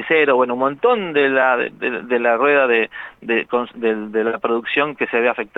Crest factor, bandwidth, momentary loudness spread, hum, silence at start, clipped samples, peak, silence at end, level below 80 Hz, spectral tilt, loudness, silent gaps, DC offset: 16 dB; 4.1 kHz; 7 LU; none; 0 s; under 0.1%; -2 dBFS; 0.1 s; -64 dBFS; -7 dB/octave; -18 LUFS; none; under 0.1%